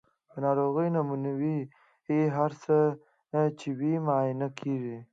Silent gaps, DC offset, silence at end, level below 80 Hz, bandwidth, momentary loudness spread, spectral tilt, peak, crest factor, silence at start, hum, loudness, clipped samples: none; under 0.1%; 0.1 s; -78 dBFS; 7.8 kHz; 9 LU; -9 dB/octave; -14 dBFS; 16 dB; 0.35 s; none; -29 LUFS; under 0.1%